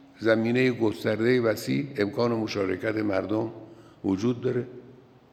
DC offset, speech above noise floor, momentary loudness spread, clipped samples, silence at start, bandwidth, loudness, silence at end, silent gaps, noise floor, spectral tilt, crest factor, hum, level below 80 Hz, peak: under 0.1%; 26 dB; 8 LU; under 0.1%; 0.2 s; 15 kHz; -26 LUFS; 0.4 s; none; -51 dBFS; -6.5 dB/octave; 18 dB; none; -68 dBFS; -8 dBFS